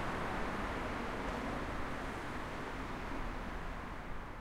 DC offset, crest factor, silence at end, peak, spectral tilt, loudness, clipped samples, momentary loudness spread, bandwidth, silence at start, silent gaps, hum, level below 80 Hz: under 0.1%; 14 dB; 0 s; -26 dBFS; -5.5 dB/octave; -41 LUFS; under 0.1%; 6 LU; 16 kHz; 0 s; none; none; -46 dBFS